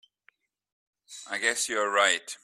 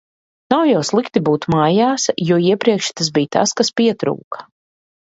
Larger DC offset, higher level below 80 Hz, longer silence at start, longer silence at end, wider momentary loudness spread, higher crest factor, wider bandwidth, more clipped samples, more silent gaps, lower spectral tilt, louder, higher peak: neither; second, -80 dBFS vs -56 dBFS; first, 1.1 s vs 0.5 s; second, 0.1 s vs 0.65 s; first, 20 LU vs 7 LU; first, 22 dB vs 16 dB; first, 15.5 kHz vs 8 kHz; neither; second, none vs 4.24-4.31 s; second, 1 dB/octave vs -4.5 dB/octave; second, -26 LUFS vs -16 LUFS; second, -8 dBFS vs 0 dBFS